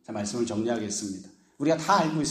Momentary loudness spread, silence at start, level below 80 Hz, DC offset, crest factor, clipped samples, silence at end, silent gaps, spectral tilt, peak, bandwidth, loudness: 10 LU; 0.1 s; -64 dBFS; under 0.1%; 18 dB; under 0.1%; 0 s; none; -4.5 dB/octave; -8 dBFS; 15 kHz; -27 LUFS